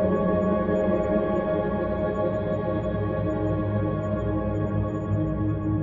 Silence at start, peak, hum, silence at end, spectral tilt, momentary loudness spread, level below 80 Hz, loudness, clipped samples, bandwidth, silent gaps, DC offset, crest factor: 0 s; -12 dBFS; none; 0 s; -10.5 dB/octave; 4 LU; -40 dBFS; -26 LUFS; under 0.1%; 7.4 kHz; none; under 0.1%; 14 dB